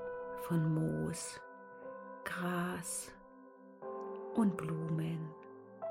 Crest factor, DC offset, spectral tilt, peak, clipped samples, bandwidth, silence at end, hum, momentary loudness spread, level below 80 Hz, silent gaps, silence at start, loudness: 18 dB; under 0.1%; -6 dB/octave; -22 dBFS; under 0.1%; 16 kHz; 0 s; none; 19 LU; -70 dBFS; none; 0 s; -38 LUFS